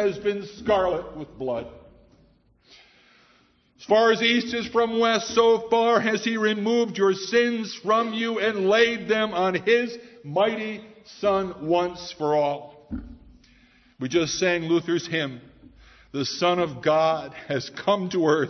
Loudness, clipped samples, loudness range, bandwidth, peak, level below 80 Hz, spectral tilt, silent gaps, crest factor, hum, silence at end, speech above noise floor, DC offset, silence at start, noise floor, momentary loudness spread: -23 LUFS; under 0.1%; 6 LU; 6.4 kHz; -6 dBFS; -56 dBFS; -4.5 dB/octave; none; 18 dB; none; 0 s; 38 dB; under 0.1%; 0 s; -61 dBFS; 12 LU